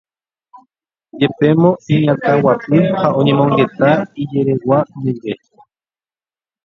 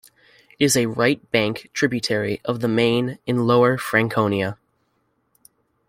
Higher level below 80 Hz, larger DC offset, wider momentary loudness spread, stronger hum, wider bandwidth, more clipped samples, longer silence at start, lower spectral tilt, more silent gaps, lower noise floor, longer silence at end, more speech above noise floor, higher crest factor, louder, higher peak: about the same, -54 dBFS vs -58 dBFS; neither; about the same, 8 LU vs 7 LU; neither; second, 7 kHz vs 16 kHz; neither; first, 1.15 s vs 0.6 s; first, -9 dB/octave vs -4.5 dB/octave; neither; first, under -90 dBFS vs -68 dBFS; about the same, 1.3 s vs 1.35 s; first, over 76 dB vs 48 dB; about the same, 16 dB vs 20 dB; first, -14 LUFS vs -20 LUFS; about the same, 0 dBFS vs -2 dBFS